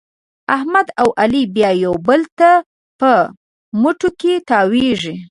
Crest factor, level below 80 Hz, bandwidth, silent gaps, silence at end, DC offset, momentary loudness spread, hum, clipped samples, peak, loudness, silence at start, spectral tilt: 14 dB; -52 dBFS; 11.5 kHz; 2.32-2.37 s, 2.66-2.99 s, 3.37-3.72 s; 0.05 s; under 0.1%; 7 LU; none; under 0.1%; 0 dBFS; -15 LUFS; 0.5 s; -5.5 dB/octave